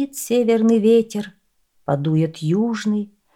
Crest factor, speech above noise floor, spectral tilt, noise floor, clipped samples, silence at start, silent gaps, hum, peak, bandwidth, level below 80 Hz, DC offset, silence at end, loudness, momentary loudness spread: 14 dB; 44 dB; -6.5 dB/octave; -62 dBFS; under 0.1%; 0 s; none; none; -6 dBFS; 16.5 kHz; -64 dBFS; under 0.1%; 0.3 s; -19 LUFS; 13 LU